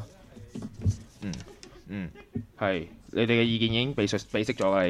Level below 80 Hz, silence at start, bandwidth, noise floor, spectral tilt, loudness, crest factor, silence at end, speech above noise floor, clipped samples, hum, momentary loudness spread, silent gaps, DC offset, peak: -52 dBFS; 0 s; 12.5 kHz; -49 dBFS; -5.5 dB/octave; -29 LUFS; 18 dB; 0 s; 22 dB; under 0.1%; none; 17 LU; none; under 0.1%; -12 dBFS